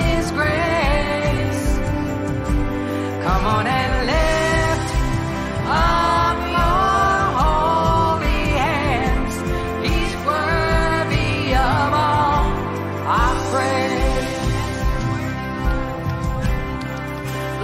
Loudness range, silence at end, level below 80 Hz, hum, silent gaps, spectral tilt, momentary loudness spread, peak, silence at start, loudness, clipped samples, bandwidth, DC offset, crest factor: 4 LU; 0 s; -26 dBFS; none; none; -5.5 dB/octave; 7 LU; -6 dBFS; 0 s; -20 LUFS; under 0.1%; 15 kHz; under 0.1%; 12 dB